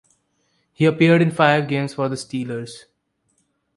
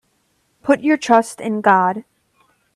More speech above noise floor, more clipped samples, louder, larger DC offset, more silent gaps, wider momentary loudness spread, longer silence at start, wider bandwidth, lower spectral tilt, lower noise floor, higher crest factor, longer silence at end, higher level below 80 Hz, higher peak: about the same, 50 dB vs 48 dB; neither; about the same, -19 LUFS vs -17 LUFS; neither; neither; first, 14 LU vs 11 LU; first, 0.8 s vs 0.65 s; second, 11.5 kHz vs 13 kHz; first, -6.5 dB/octave vs -5 dB/octave; first, -68 dBFS vs -64 dBFS; about the same, 20 dB vs 18 dB; first, 0.95 s vs 0.75 s; about the same, -62 dBFS vs -64 dBFS; about the same, -2 dBFS vs 0 dBFS